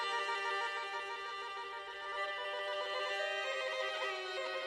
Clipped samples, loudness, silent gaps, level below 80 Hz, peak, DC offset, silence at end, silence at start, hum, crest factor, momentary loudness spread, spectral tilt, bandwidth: under 0.1%; -38 LUFS; none; -80 dBFS; -26 dBFS; under 0.1%; 0 s; 0 s; none; 14 dB; 6 LU; 0 dB/octave; 12 kHz